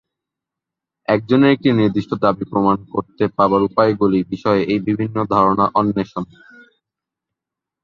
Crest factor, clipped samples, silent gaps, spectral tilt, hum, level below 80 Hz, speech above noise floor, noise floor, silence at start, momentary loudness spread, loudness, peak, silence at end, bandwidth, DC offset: 16 dB; under 0.1%; none; -8.5 dB/octave; none; -52 dBFS; 68 dB; -85 dBFS; 1.1 s; 8 LU; -17 LUFS; -2 dBFS; 1.6 s; 6.8 kHz; under 0.1%